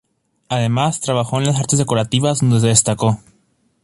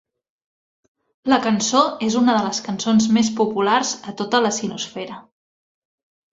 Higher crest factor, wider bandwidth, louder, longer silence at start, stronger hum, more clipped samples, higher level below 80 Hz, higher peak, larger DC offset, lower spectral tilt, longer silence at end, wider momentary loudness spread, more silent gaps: about the same, 18 dB vs 20 dB; first, 11.5 kHz vs 7.8 kHz; about the same, -17 LUFS vs -19 LUFS; second, 0.5 s vs 1.25 s; neither; neither; first, -48 dBFS vs -62 dBFS; about the same, 0 dBFS vs -2 dBFS; neither; about the same, -4.5 dB/octave vs -3.5 dB/octave; second, 0.7 s vs 1.1 s; second, 7 LU vs 12 LU; neither